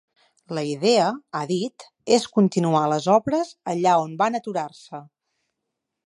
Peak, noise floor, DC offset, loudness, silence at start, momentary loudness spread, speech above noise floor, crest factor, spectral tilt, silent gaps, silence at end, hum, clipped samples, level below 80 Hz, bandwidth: -2 dBFS; -81 dBFS; under 0.1%; -22 LUFS; 0.5 s; 14 LU; 60 dB; 20 dB; -5.5 dB/octave; none; 1 s; none; under 0.1%; -68 dBFS; 11.5 kHz